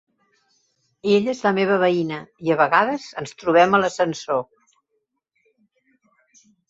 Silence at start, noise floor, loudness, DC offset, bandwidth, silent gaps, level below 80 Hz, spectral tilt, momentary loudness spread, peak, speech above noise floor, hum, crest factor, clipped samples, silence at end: 1.05 s; -75 dBFS; -20 LUFS; under 0.1%; 8 kHz; none; -64 dBFS; -5.5 dB/octave; 12 LU; -2 dBFS; 55 dB; none; 20 dB; under 0.1%; 2.25 s